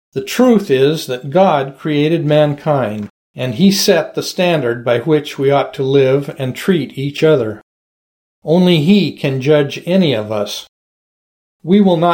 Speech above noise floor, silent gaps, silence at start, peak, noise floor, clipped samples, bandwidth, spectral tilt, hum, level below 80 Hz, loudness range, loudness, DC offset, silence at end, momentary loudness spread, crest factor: over 77 dB; 3.10-3.34 s, 7.63-8.42 s, 10.69-11.60 s; 0.15 s; 0 dBFS; under -90 dBFS; under 0.1%; 17 kHz; -6 dB/octave; none; -58 dBFS; 2 LU; -14 LUFS; under 0.1%; 0 s; 11 LU; 14 dB